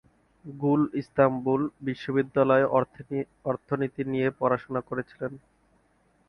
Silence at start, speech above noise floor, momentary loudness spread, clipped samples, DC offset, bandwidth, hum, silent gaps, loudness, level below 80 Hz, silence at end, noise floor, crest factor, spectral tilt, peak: 0.45 s; 40 dB; 11 LU; under 0.1%; under 0.1%; 6.2 kHz; none; none; -27 LUFS; -64 dBFS; 0.9 s; -66 dBFS; 20 dB; -9 dB/octave; -6 dBFS